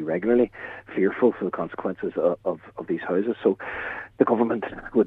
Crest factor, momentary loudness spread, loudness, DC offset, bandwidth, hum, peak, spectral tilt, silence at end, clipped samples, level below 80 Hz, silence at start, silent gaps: 20 dB; 10 LU; -25 LUFS; under 0.1%; 4 kHz; none; -4 dBFS; -9.5 dB/octave; 0 s; under 0.1%; -58 dBFS; 0 s; none